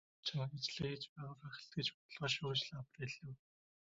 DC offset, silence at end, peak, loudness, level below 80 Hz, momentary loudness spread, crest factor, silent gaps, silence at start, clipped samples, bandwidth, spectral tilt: under 0.1%; 0.6 s; -24 dBFS; -43 LUFS; -74 dBFS; 12 LU; 22 dB; 1.09-1.16 s, 1.94-2.09 s; 0.25 s; under 0.1%; 7.6 kHz; -3 dB/octave